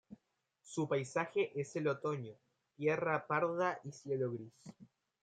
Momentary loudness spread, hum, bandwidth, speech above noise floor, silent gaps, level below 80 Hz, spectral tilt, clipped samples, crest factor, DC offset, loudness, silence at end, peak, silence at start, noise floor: 13 LU; none; 9.2 kHz; 42 dB; none; -84 dBFS; -6 dB/octave; under 0.1%; 20 dB; under 0.1%; -38 LUFS; 0.4 s; -20 dBFS; 0.1 s; -79 dBFS